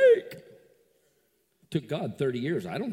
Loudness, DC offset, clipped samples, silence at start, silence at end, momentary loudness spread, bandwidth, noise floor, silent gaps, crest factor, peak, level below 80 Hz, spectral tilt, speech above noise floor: -29 LUFS; under 0.1%; under 0.1%; 0 s; 0 s; 15 LU; 16 kHz; -71 dBFS; none; 18 dB; -10 dBFS; -72 dBFS; -7 dB/octave; 41 dB